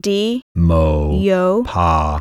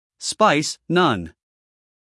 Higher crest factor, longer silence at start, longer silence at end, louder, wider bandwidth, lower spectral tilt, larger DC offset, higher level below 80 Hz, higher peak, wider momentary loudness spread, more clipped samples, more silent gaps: second, 12 dB vs 20 dB; second, 0.05 s vs 0.2 s; second, 0 s vs 0.85 s; first, -16 LUFS vs -20 LUFS; about the same, 11.5 kHz vs 12 kHz; first, -7 dB/octave vs -4 dB/octave; neither; first, -24 dBFS vs -60 dBFS; about the same, -2 dBFS vs -2 dBFS; second, 3 LU vs 11 LU; neither; first, 0.42-0.55 s vs none